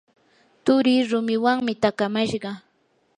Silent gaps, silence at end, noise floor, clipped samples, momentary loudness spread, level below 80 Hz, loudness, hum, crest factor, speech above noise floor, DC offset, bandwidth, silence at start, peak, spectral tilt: none; 0.6 s; -66 dBFS; under 0.1%; 11 LU; -64 dBFS; -22 LUFS; none; 18 dB; 45 dB; under 0.1%; 10 kHz; 0.65 s; -4 dBFS; -5.5 dB/octave